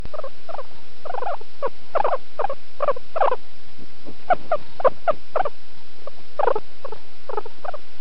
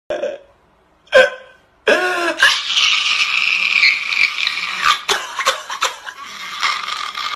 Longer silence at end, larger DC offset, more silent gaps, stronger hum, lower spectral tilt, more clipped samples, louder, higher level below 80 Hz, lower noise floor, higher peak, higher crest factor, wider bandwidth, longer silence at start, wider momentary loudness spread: first, 0.25 s vs 0 s; first, 20% vs under 0.1%; neither; neither; first, -3.5 dB/octave vs 0.5 dB/octave; neither; second, -26 LUFS vs -15 LUFS; about the same, -54 dBFS vs -58 dBFS; second, -49 dBFS vs -55 dBFS; second, -4 dBFS vs 0 dBFS; about the same, 22 dB vs 18 dB; second, 6.2 kHz vs 14.5 kHz; about the same, 0 s vs 0.1 s; first, 20 LU vs 12 LU